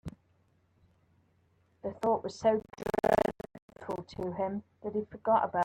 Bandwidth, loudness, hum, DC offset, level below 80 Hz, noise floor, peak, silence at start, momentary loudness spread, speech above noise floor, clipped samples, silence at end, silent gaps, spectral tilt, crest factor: 16.5 kHz; -32 LUFS; none; under 0.1%; -62 dBFS; -70 dBFS; -12 dBFS; 0.05 s; 16 LU; 38 dB; under 0.1%; 0 s; 3.62-3.68 s; -6.5 dB/octave; 20 dB